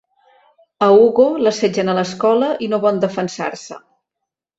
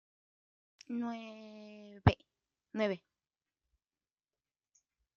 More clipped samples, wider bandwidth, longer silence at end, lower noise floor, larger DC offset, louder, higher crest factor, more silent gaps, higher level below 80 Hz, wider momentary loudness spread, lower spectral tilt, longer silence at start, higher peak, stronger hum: neither; first, 8 kHz vs 7.2 kHz; second, 0.8 s vs 2.2 s; second, -81 dBFS vs under -90 dBFS; neither; first, -16 LUFS vs -36 LUFS; second, 16 dB vs 32 dB; neither; second, -62 dBFS vs -56 dBFS; second, 14 LU vs 20 LU; about the same, -5.5 dB/octave vs -6 dB/octave; about the same, 0.8 s vs 0.9 s; first, -2 dBFS vs -8 dBFS; neither